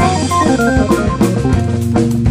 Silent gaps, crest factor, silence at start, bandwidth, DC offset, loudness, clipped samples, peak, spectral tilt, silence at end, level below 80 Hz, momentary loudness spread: none; 12 dB; 0 s; 15.5 kHz; under 0.1%; -13 LUFS; under 0.1%; 0 dBFS; -6.5 dB/octave; 0 s; -26 dBFS; 3 LU